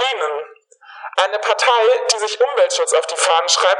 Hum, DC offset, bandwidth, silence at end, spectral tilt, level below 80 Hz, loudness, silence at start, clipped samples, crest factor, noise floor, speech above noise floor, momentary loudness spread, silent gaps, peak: none; under 0.1%; 11.5 kHz; 0 s; 4 dB/octave; under -90 dBFS; -16 LUFS; 0 s; under 0.1%; 16 dB; -43 dBFS; 27 dB; 10 LU; none; -2 dBFS